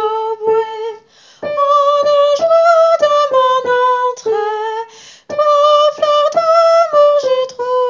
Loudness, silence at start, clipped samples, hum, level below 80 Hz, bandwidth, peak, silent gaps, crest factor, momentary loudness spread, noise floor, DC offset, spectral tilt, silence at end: -12 LUFS; 0 s; under 0.1%; none; -64 dBFS; 7.6 kHz; 0 dBFS; none; 12 dB; 12 LU; -40 dBFS; under 0.1%; -2 dB/octave; 0 s